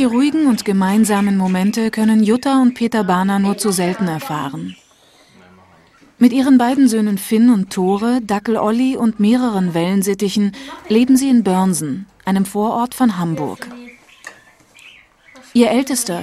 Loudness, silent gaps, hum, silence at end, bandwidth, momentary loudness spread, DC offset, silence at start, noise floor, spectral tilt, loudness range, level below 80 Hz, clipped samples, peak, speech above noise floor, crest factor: -16 LUFS; none; none; 0 s; 15 kHz; 9 LU; under 0.1%; 0 s; -50 dBFS; -5.5 dB/octave; 6 LU; -56 dBFS; under 0.1%; 0 dBFS; 35 dB; 16 dB